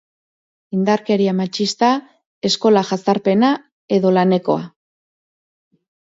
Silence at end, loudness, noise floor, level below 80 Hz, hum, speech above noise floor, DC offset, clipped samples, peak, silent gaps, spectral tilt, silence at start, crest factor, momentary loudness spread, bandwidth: 1.45 s; -17 LUFS; under -90 dBFS; -64 dBFS; none; over 74 dB; under 0.1%; under 0.1%; -2 dBFS; 2.26-2.41 s, 3.72-3.88 s; -5.5 dB/octave; 0.7 s; 16 dB; 8 LU; 8 kHz